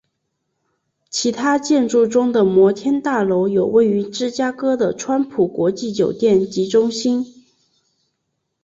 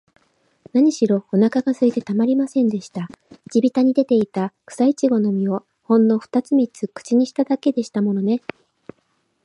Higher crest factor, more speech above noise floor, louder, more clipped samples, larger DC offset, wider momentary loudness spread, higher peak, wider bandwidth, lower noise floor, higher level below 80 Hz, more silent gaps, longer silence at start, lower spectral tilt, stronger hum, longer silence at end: about the same, 14 dB vs 16 dB; first, 57 dB vs 48 dB; about the same, -17 LUFS vs -19 LUFS; neither; neither; second, 6 LU vs 10 LU; about the same, -4 dBFS vs -4 dBFS; second, 8 kHz vs 11 kHz; first, -74 dBFS vs -67 dBFS; first, -60 dBFS vs -70 dBFS; neither; first, 1.15 s vs 0.75 s; second, -5 dB/octave vs -7 dB/octave; neither; first, 1.35 s vs 1.05 s